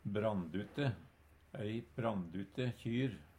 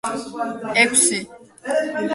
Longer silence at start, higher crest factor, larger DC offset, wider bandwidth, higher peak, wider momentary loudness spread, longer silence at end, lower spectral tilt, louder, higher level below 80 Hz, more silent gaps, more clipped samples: about the same, 0.05 s vs 0.05 s; about the same, 18 dB vs 20 dB; neither; first, 14 kHz vs 12 kHz; second, -22 dBFS vs -2 dBFS; second, 7 LU vs 16 LU; first, 0.15 s vs 0 s; first, -8 dB/octave vs -1.5 dB/octave; second, -40 LUFS vs -19 LUFS; about the same, -66 dBFS vs -64 dBFS; neither; neither